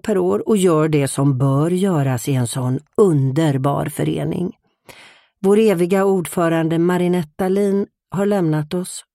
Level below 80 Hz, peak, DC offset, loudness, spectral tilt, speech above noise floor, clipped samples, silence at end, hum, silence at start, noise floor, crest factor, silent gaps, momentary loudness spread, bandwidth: -54 dBFS; -2 dBFS; under 0.1%; -18 LUFS; -7 dB/octave; 30 dB; under 0.1%; 0.15 s; none; 0.05 s; -47 dBFS; 16 dB; none; 7 LU; 16 kHz